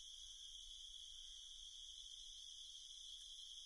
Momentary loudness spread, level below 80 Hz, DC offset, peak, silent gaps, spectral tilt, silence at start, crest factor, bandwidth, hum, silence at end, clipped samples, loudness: 1 LU; -70 dBFS; under 0.1%; -44 dBFS; none; 3.5 dB/octave; 0 s; 12 dB; 12 kHz; none; 0 s; under 0.1%; -54 LUFS